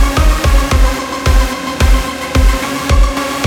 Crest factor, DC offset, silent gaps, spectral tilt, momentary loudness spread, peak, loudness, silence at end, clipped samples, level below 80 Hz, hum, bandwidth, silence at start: 10 dB; under 0.1%; none; -5 dB/octave; 4 LU; 0 dBFS; -14 LUFS; 0 s; under 0.1%; -12 dBFS; none; 17 kHz; 0 s